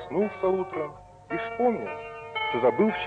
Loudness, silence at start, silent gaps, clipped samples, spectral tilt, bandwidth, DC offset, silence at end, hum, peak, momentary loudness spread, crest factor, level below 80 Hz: -28 LUFS; 0 s; none; under 0.1%; -7.5 dB/octave; 8.4 kHz; under 0.1%; 0 s; none; -10 dBFS; 12 LU; 18 dB; -60 dBFS